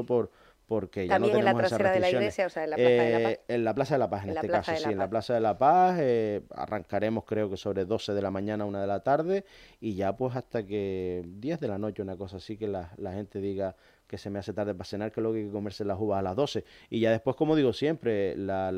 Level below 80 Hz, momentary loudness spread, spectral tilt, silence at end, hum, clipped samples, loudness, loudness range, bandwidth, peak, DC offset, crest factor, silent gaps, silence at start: -62 dBFS; 12 LU; -7 dB/octave; 0 s; none; under 0.1%; -29 LUFS; 9 LU; 13.5 kHz; -8 dBFS; under 0.1%; 20 dB; none; 0 s